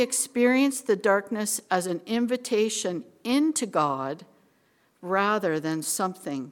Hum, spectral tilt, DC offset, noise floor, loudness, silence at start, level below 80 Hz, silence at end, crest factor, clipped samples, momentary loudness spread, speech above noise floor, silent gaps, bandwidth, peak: none; -3.5 dB/octave; under 0.1%; -66 dBFS; -26 LUFS; 0 s; -76 dBFS; 0 s; 18 dB; under 0.1%; 9 LU; 40 dB; none; 18 kHz; -8 dBFS